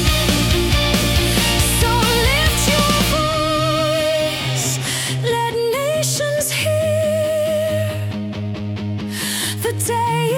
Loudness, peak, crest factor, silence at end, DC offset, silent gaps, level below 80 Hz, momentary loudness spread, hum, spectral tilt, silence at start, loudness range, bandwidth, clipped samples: -17 LUFS; -4 dBFS; 12 dB; 0 s; under 0.1%; none; -28 dBFS; 8 LU; none; -4 dB/octave; 0 s; 5 LU; 18 kHz; under 0.1%